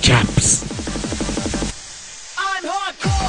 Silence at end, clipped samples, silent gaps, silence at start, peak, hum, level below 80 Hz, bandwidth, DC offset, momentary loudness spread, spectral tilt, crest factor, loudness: 0 s; under 0.1%; none; 0 s; -2 dBFS; none; -30 dBFS; 11.5 kHz; under 0.1%; 16 LU; -3.5 dB/octave; 18 dB; -20 LUFS